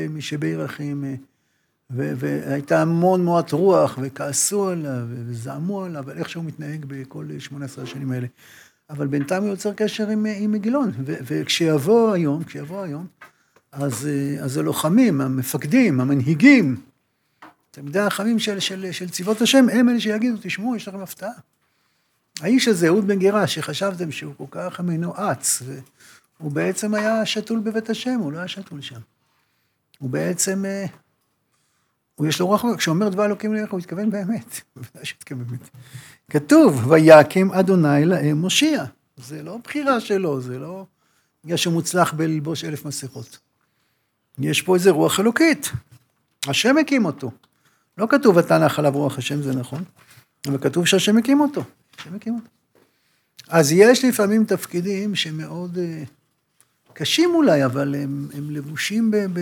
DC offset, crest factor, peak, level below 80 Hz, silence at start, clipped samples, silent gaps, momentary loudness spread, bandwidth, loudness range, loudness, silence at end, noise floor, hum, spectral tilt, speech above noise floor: under 0.1%; 20 dB; 0 dBFS; -70 dBFS; 0 s; under 0.1%; none; 17 LU; 19.5 kHz; 9 LU; -20 LUFS; 0 s; -70 dBFS; none; -5 dB/octave; 50 dB